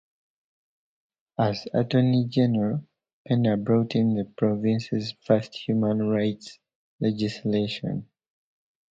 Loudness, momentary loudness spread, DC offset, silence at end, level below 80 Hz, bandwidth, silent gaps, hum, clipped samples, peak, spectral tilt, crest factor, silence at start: -25 LUFS; 8 LU; under 0.1%; 0.85 s; -62 dBFS; 7.6 kHz; 3.13-3.25 s, 6.75-6.99 s; none; under 0.1%; -6 dBFS; -8 dB/octave; 20 dB; 1.4 s